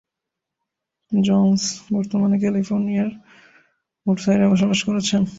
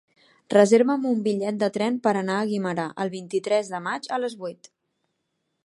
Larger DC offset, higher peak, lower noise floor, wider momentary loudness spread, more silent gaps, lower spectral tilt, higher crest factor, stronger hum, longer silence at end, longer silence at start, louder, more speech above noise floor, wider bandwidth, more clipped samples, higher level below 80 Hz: neither; about the same, -6 dBFS vs -4 dBFS; first, -83 dBFS vs -77 dBFS; second, 7 LU vs 12 LU; neither; about the same, -5.5 dB/octave vs -5.5 dB/octave; second, 14 dB vs 20 dB; neither; second, 0 s vs 1.1 s; first, 1.1 s vs 0.5 s; first, -20 LUFS vs -24 LUFS; first, 65 dB vs 54 dB; second, 8 kHz vs 11.5 kHz; neither; first, -56 dBFS vs -76 dBFS